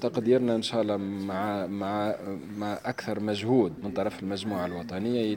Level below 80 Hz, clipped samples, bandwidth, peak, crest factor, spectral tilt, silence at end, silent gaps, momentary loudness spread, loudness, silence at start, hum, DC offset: -68 dBFS; under 0.1%; 17 kHz; -10 dBFS; 18 dB; -6.5 dB/octave; 0 s; none; 9 LU; -29 LUFS; 0 s; none; under 0.1%